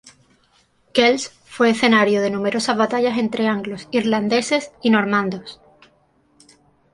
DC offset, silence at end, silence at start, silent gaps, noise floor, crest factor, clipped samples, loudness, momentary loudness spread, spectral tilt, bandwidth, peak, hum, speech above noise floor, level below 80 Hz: under 0.1%; 1.4 s; 0.05 s; none; -60 dBFS; 18 dB; under 0.1%; -19 LUFS; 9 LU; -4.5 dB/octave; 11.5 kHz; -2 dBFS; none; 41 dB; -62 dBFS